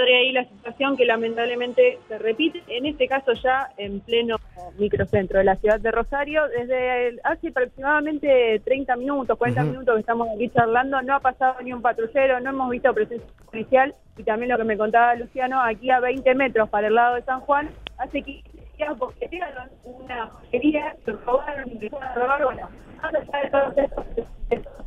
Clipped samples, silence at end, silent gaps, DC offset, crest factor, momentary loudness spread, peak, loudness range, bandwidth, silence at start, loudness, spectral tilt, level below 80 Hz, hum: under 0.1%; 0 s; none; under 0.1%; 20 dB; 13 LU; -4 dBFS; 6 LU; 7 kHz; 0 s; -22 LUFS; -7 dB/octave; -44 dBFS; none